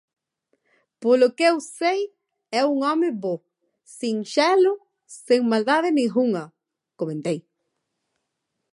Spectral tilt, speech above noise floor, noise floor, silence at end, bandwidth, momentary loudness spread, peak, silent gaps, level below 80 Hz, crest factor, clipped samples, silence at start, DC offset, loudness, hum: -5 dB/octave; 58 dB; -79 dBFS; 1.35 s; 11.5 kHz; 13 LU; -6 dBFS; none; -82 dBFS; 18 dB; under 0.1%; 1 s; under 0.1%; -22 LUFS; none